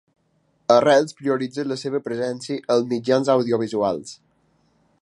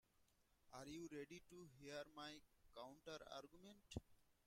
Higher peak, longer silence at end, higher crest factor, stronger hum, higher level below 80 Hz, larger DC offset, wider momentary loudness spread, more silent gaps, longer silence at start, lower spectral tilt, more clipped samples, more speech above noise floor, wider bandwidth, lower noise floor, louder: first, -2 dBFS vs -34 dBFS; first, 0.9 s vs 0.15 s; second, 20 dB vs 26 dB; neither; first, -68 dBFS vs -76 dBFS; neither; about the same, 10 LU vs 10 LU; neither; first, 0.7 s vs 0.15 s; about the same, -5.5 dB/octave vs -4.5 dB/octave; neither; first, 45 dB vs 23 dB; second, 11.5 kHz vs 16 kHz; second, -65 dBFS vs -81 dBFS; first, -21 LUFS vs -58 LUFS